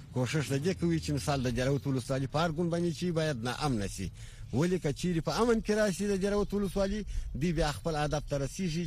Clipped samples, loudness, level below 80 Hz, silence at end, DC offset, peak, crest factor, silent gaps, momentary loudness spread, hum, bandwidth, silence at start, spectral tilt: under 0.1%; -32 LUFS; -44 dBFS; 0 s; under 0.1%; -14 dBFS; 16 dB; none; 5 LU; none; 15.5 kHz; 0 s; -6 dB/octave